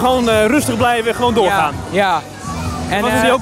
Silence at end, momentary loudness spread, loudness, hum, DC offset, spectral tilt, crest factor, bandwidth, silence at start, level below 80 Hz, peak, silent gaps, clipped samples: 0 s; 9 LU; -15 LUFS; none; under 0.1%; -4.5 dB/octave; 14 dB; 16 kHz; 0 s; -36 dBFS; -2 dBFS; none; under 0.1%